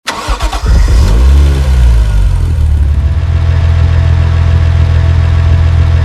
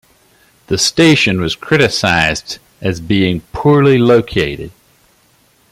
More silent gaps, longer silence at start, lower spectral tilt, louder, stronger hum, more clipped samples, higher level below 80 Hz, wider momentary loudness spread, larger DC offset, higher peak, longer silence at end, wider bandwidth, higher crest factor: neither; second, 0.05 s vs 0.7 s; first, -6.5 dB/octave vs -4.5 dB/octave; first, -10 LUFS vs -13 LUFS; neither; first, 0.9% vs under 0.1%; first, -10 dBFS vs -40 dBFS; second, 3 LU vs 12 LU; neither; about the same, 0 dBFS vs 0 dBFS; second, 0 s vs 1 s; second, 11 kHz vs 16 kHz; second, 8 dB vs 14 dB